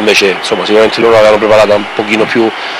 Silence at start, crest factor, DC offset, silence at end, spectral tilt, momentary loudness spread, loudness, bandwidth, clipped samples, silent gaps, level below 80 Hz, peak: 0 s; 8 dB; under 0.1%; 0 s; -4 dB/octave; 6 LU; -8 LUFS; 15.5 kHz; 0.3%; none; -42 dBFS; 0 dBFS